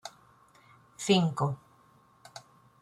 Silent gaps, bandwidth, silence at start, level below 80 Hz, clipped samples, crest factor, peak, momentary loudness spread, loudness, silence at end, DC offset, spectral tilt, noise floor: none; 13.5 kHz; 0.05 s; -70 dBFS; under 0.1%; 20 dB; -14 dBFS; 24 LU; -28 LUFS; 0.45 s; under 0.1%; -5.5 dB/octave; -62 dBFS